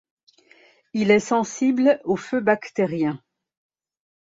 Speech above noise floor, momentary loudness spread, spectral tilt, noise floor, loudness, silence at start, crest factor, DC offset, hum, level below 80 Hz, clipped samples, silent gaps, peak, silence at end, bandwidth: 35 dB; 8 LU; -5.5 dB/octave; -56 dBFS; -22 LUFS; 0.95 s; 20 dB; under 0.1%; none; -66 dBFS; under 0.1%; none; -4 dBFS; 1.05 s; 8 kHz